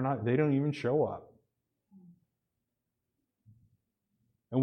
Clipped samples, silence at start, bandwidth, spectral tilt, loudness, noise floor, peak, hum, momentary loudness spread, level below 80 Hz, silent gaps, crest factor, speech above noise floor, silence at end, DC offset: under 0.1%; 0 s; 9.4 kHz; -9 dB/octave; -31 LUFS; -86 dBFS; -16 dBFS; none; 7 LU; -74 dBFS; none; 18 dB; 56 dB; 0 s; under 0.1%